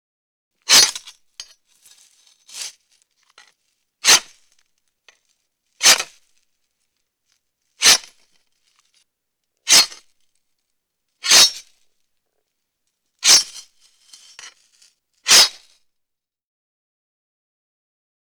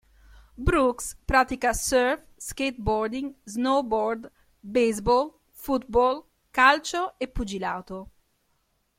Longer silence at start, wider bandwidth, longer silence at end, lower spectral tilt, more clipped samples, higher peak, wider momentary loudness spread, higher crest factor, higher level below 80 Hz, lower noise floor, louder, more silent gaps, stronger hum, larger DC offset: about the same, 0.7 s vs 0.6 s; first, over 20 kHz vs 16.5 kHz; first, 2.8 s vs 0.95 s; second, 2.5 dB/octave vs -4 dB/octave; neither; first, -2 dBFS vs -6 dBFS; first, 22 LU vs 13 LU; about the same, 20 dB vs 20 dB; second, -62 dBFS vs -42 dBFS; first, -78 dBFS vs -71 dBFS; first, -13 LUFS vs -25 LUFS; neither; neither; neither